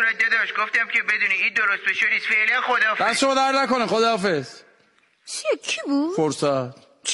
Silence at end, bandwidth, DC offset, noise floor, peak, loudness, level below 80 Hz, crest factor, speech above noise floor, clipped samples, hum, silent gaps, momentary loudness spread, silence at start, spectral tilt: 0 s; 11.5 kHz; under 0.1%; -61 dBFS; -8 dBFS; -20 LUFS; -68 dBFS; 14 dB; 39 dB; under 0.1%; none; none; 8 LU; 0 s; -3 dB/octave